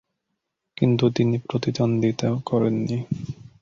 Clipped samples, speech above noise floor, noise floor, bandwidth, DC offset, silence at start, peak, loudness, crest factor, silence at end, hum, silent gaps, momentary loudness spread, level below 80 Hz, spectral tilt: under 0.1%; 57 dB; -79 dBFS; 7.4 kHz; under 0.1%; 0.8 s; -4 dBFS; -23 LUFS; 18 dB; 0.3 s; none; none; 9 LU; -56 dBFS; -7.5 dB/octave